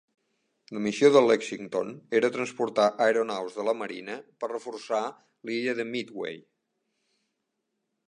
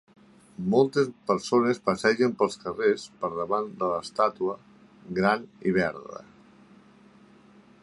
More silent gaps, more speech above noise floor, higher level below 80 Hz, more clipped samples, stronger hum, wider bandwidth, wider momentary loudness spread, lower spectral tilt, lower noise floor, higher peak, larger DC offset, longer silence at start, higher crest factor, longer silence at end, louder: neither; first, 54 dB vs 29 dB; second, -78 dBFS vs -64 dBFS; neither; neither; second, 10 kHz vs 11.5 kHz; first, 16 LU vs 11 LU; second, -4.5 dB/octave vs -6 dB/octave; first, -81 dBFS vs -55 dBFS; about the same, -6 dBFS vs -6 dBFS; neither; about the same, 0.7 s vs 0.6 s; about the same, 22 dB vs 20 dB; about the same, 1.7 s vs 1.6 s; about the same, -27 LUFS vs -26 LUFS